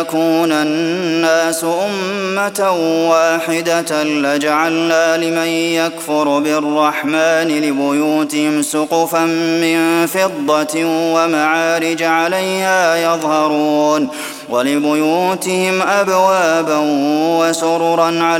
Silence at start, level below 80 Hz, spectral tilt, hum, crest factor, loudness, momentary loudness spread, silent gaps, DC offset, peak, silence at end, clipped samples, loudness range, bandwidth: 0 s; -66 dBFS; -4 dB/octave; none; 14 dB; -14 LUFS; 3 LU; none; under 0.1%; 0 dBFS; 0 s; under 0.1%; 1 LU; 17 kHz